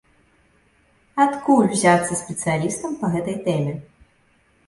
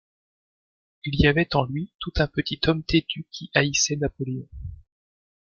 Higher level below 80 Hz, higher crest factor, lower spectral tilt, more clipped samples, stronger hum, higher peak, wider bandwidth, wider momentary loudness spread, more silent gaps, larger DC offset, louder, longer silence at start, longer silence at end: second, -56 dBFS vs -40 dBFS; second, 18 dB vs 24 dB; first, -5.5 dB/octave vs -4 dB/octave; neither; neither; about the same, -4 dBFS vs -2 dBFS; first, 11.5 kHz vs 7.4 kHz; second, 9 LU vs 14 LU; second, none vs 1.95-1.99 s; neither; first, -21 LUFS vs -24 LUFS; about the same, 1.15 s vs 1.05 s; about the same, 0.85 s vs 0.75 s